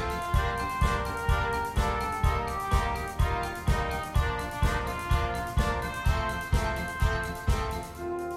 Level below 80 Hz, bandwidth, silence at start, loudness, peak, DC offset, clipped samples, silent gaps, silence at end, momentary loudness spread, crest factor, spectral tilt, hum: -32 dBFS; 16 kHz; 0 s; -29 LUFS; -12 dBFS; under 0.1%; under 0.1%; none; 0 s; 3 LU; 16 dB; -5.5 dB/octave; none